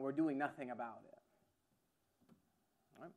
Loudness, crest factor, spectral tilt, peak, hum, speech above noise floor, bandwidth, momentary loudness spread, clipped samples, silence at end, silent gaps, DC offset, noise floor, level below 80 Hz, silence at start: -43 LUFS; 20 dB; -8 dB/octave; -26 dBFS; none; 40 dB; 9.4 kHz; 21 LU; under 0.1%; 0.05 s; none; under 0.1%; -82 dBFS; under -90 dBFS; 0 s